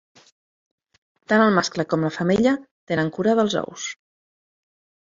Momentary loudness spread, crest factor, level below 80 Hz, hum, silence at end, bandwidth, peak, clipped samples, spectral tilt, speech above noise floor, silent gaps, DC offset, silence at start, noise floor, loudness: 13 LU; 20 dB; -60 dBFS; none; 1.2 s; 7.8 kHz; -4 dBFS; under 0.1%; -5.5 dB/octave; over 70 dB; 2.71-2.87 s; under 0.1%; 1.3 s; under -90 dBFS; -21 LUFS